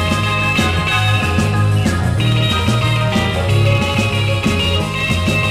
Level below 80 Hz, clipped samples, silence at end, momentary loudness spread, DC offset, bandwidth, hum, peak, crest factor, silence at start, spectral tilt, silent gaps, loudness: -30 dBFS; under 0.1%; 0 s; 2 LU; 0.2%; 15.5 kHz; none; -2 dBFS; 14 dB; 0 s; -5.5 dB/octave; none; -15 LUFS